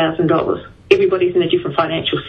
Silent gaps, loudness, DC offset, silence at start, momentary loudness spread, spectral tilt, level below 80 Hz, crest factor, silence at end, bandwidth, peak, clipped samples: none; -16 LUFS; under 0.1%; 0 s; 5 LU; -7 dB/octave; -48 dBFS; 16 dB; 0 s; 6.8 kHz; 0 dBFS; under 0.1%